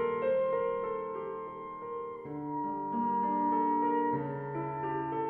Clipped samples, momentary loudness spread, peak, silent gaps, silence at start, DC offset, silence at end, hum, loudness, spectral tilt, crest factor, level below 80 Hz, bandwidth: under 0.1%; 11 LU; -20 dBFS; none; 0 s; under 0.1%; 0 s; none; -33 LUFS; -10.5 dB/octave; 14 dB; -68 dBFS; 4 kHz